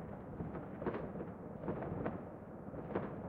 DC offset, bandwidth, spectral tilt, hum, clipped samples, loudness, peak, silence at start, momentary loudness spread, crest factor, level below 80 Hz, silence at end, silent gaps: under 0.1%; 4.8 kHz; -10.5 dB/octave; none; under 0.1%; -44 LUFS; -24 dBFS; 0 s; 6 LU; 20 dB; -62 dBFS; 0 s; none